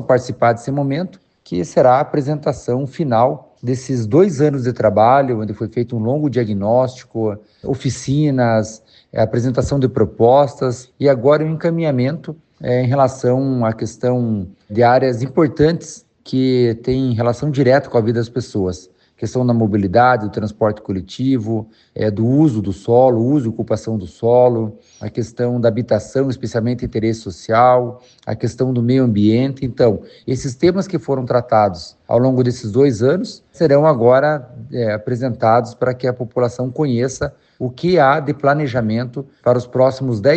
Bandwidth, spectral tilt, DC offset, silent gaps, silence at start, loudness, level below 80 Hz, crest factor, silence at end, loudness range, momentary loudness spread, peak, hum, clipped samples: 8.6 kHz; -7.5 dB/octave; under 0.1%; none; 0 s; -17 LUFS; -48 dBFS; 16 dB; 0 s; 2 LU; 11 LU; 0 dBFS; none; under 0.1%